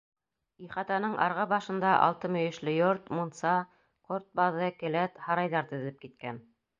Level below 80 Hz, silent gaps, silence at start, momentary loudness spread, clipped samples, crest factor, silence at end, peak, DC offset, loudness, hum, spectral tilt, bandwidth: -74 dBFS; none; 0.6 s; 14 LU; under 0.1%; 22 dB; 0.4 s; -10 dBFS; under 0.1%; -30 LUFS; none; -6.5 dB/octave; 7.6 kHz